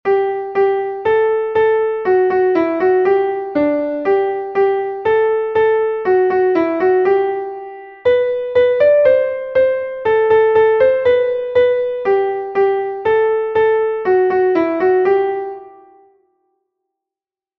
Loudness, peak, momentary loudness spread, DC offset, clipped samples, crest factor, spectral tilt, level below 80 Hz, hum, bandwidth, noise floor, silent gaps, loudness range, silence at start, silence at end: -15 LUFS; -2 dBFS; 6 LU; under 0.1%; under 0.1%; 14 dB; -7.5 dB/octave; -54 dBFS; none; 5.2 kHz; -89 dBFS; none; 3 LU; 0.05 s; 1.9 s